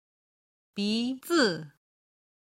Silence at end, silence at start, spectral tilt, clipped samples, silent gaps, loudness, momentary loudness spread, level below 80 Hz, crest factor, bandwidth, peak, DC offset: 0.8 s; 0.75 s; -4 dB/octave; under 0.1%; none; -28 LUFS; 13 LU; -74 dBFS; 20 dB; 16 kHz; -12 dBFS; under 0.1%